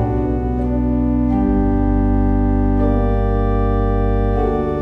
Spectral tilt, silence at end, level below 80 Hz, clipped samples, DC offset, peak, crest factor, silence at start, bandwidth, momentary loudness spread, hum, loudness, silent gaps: -11 dB/octave; 0 s; -20 dBFS; under 0.1%; under 0.1%; -4 dBFS; 10 dB; 0 s; 3.7 kHz; 2 LU; none; -18 LUFS; none